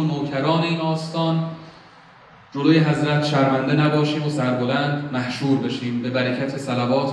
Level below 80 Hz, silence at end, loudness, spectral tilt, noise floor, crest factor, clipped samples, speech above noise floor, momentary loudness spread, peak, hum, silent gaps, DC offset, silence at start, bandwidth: -64 dBFS; 0 s; -21 LUFS; -7 dB/octave; -48 dBFS; 16 dB; under 0.1%; 27 dB; 7 LU; -4 dBFS; none; none; under 0.1%; 0 s; 10.5 kHz